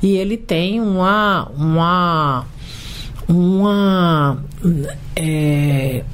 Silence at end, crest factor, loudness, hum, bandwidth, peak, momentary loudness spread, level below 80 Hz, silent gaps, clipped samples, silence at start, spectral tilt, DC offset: 0 s; 10 dB; -16 LUFS; none; 16 kHz; -6 dBFS; 11 LU; -34 dBFS; none; under 0.1%; 0 s; -7 dB/octave; under 0.1%